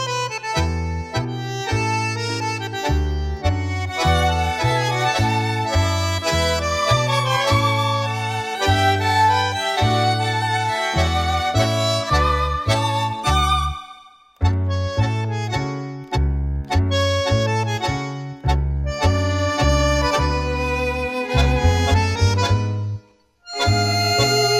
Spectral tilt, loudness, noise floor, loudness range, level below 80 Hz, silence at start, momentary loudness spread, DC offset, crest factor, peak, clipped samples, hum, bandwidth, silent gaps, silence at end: -4.5 dB/octave; -20 LUFS; -51 dBFS; 4 LU; -28 dBFS; 0 s; 7 LU; under 0.1%; 16 dB; -4 dBFS; under 0.1%; none; 15.5 kHz; none; 0 s